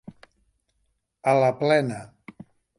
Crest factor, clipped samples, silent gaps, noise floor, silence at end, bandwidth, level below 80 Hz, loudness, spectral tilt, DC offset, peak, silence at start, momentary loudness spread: 18 dB; under 0.1%; none; -73 dBFS; 0.75 s; 11.5 kHz; -68 dBFS; -22 LUFS; -6.5 dB/octave; under 0.1%; -8 dBFS; 1.25 s; 11 LU